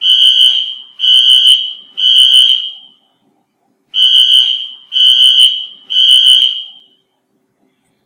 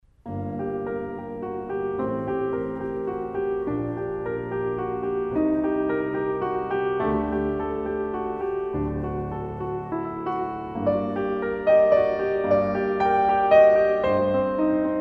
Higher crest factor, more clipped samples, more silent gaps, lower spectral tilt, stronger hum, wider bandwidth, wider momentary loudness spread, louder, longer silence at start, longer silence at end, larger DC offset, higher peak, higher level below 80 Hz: second, 10 dB vs 18 dB; first, 2% vs under 0.1%; neither; second, 4.5 dB/octave vs -9 dB/octave; neither; first, over 20 kHz vs 5.8 kHz; first, 14 LU vs 11 LU; first, -6 LUFS vs -24 LUFS; second, 0 s vs 0.25 s; first, 1.35 s vs 0 s; neither; first, 0 dBFS vs -6 dBFS; second, -70 dBFS vs -46 dBFS